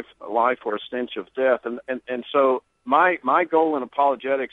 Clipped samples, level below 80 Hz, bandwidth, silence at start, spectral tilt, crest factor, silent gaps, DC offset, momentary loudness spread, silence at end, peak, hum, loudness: under 0.1%; -70 dBFS; 4.1 kHz; 0 s; -6.5 dB/octave; 18 dB; none; under 0.1%; 10 LU; 0.05 s; -4 dBFS; none; -22 LUFS